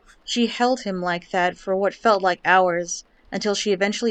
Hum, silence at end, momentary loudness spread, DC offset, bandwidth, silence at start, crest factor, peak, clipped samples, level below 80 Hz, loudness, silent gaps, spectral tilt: none; 0 s; 9 LU; under 0.1%; 9.2 kHz; 0.25 s; 18 dB; -4 dBFS; under 0.1%; -58 dBFS; -22 LUFS; none; -3.5 dB/octave